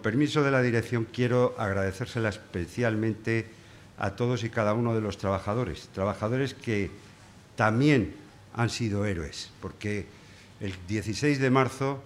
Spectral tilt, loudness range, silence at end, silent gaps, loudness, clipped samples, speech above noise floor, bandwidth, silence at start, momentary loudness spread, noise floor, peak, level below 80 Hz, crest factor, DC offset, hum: -6.5 dB/octave; 2 LU; 0 s; none; -28 LUFS; under 0.1%; 24 dB; 13.5 kHz; 0 s; 13 LU; -52 dBFS; -6 dBFS; -56 dBFS; 22 dB; under 0.1%; none